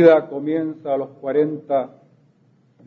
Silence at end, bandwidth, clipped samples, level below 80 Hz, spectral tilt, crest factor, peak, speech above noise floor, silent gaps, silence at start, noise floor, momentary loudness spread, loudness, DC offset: 1 s; 5 kHz; under 0.1%; -74 dBFS; -9 dB/octave; 20 dB; 0 dBFS; 39 dB; none; 0 s; -58 dBFS; 7 LU; -21 LUFS; under 0.1%